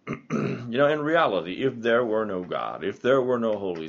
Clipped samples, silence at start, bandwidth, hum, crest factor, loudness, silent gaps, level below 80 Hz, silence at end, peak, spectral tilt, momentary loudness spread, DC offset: under 0.1%; 0.05 s; 7.2 kHz; none; 18 dB; -25 LUFS; none; -66 dBFS; 0 s; -6 dBFS; -4.5 dB/octave; 7 LU; under 0.1%